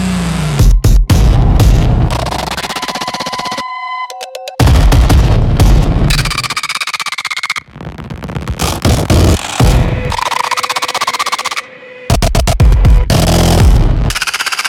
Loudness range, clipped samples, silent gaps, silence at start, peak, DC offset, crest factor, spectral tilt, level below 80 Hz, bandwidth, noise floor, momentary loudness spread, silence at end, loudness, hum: 3 LU; under 0.1%; none; 0 s; 0 dBFS; under 0.1%; 10 dB; -5 dB/octave; -14 dBFS; 17 kHz; -30 dBFS; 11 LU; 0 s; -12 LUFS; none